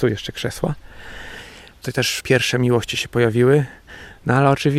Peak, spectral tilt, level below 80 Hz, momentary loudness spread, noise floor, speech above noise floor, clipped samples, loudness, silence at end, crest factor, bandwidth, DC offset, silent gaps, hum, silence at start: -2 dBFS; -5.5 dB/octave; -46 dBFS; 21 LU; -40 dBFS; 21 dB; under 0.1%; -19 LUFS; 0 s; 18 dB; 15.5 kHz; under 0.1%; none; none; 0 s